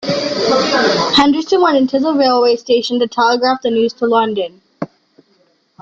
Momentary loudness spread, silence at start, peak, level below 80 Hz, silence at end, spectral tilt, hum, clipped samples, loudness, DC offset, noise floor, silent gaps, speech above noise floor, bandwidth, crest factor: 11 LU; 0 s; -2 dBFS; -54 dBFS; 0.95 s; -2 dB/octave; none; under 0.1%; -13 LUFS; under 0.1%; -57 dBFS; none; 43 dB; 7.6 kHz; 12 dB